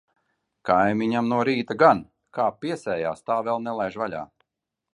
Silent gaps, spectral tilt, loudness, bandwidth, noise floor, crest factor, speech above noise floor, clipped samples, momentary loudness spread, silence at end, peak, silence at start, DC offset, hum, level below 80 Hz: none; -6.5 dB/octave; -24 LUFS; 11 kHz; -84 dBFS; 22 dB; 61 dB; under 0.1%; 13 LU; 0.7 s; -2 dBFS; 0.65 s; under 0.1%; none; -62 dBFS